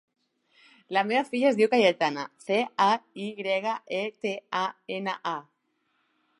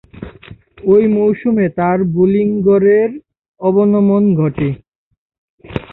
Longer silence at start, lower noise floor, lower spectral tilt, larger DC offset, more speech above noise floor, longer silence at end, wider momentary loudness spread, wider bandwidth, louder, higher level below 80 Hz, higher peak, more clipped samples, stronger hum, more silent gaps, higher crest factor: first, 0.9 s vs 0.15 s; first, -74 dBFS vs -39 dBFS; second, -4.5 dB/octave vs -12.5 dB/octave; neither; first, 47 dB vs 27 dB; first, 1 s vs 0.1 s; second, 12 LU vs 17 LU; first, 11.5 kHz vs 4 kHz; second, -27 LUFS vs -13 LUFS; second, -82 dBFS vs -46 dBFS; second, -8 dBFS vs -2 dBFS; neither; neither; second, none vs 3.48-3.54 s, 4.88-5.11 s, 5.18-5.30 s, 5.38-5.58 s; first, 20 dB vs 12 dB